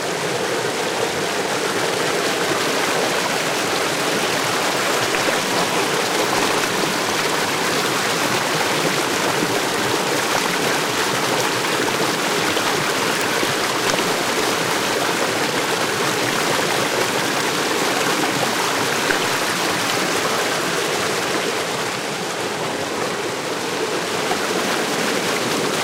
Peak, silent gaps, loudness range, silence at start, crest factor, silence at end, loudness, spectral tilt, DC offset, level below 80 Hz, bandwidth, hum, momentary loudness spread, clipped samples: -4 dBFS; none; 3 LU; 0 s; 18 dB; 0 s; -19 LUFS; -2.5 dB/octave; under 0.1%; -60 dBFS; 16 kHz; none; 3 LU; under 0.1%